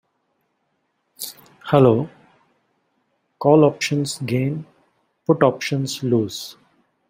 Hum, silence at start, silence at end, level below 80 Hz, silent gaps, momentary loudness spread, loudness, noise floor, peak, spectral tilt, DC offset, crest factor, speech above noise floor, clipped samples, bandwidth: none; 1.2 s; 0.55 s; -60 dBFS; none; 18 LU; -19 LUFS; -71 dBFS; -2 dBFS; -6 dB/octave; under 0.1%; 20 dB; 53 dB; under 0.1%; 16 kHz